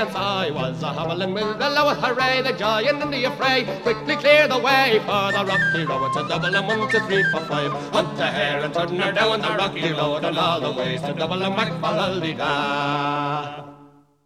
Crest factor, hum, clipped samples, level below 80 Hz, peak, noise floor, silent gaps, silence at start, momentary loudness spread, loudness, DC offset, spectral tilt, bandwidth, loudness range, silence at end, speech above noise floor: 18 dB; none; under 0.1%; -54 dBFS; -2 dBFS; -50 dBFS; none; 0 s; 8 LU; -21 LUFS; under 0.1%; -5 dB/octave; 15 kHz; 4 LU; 0.4 s; 29 dB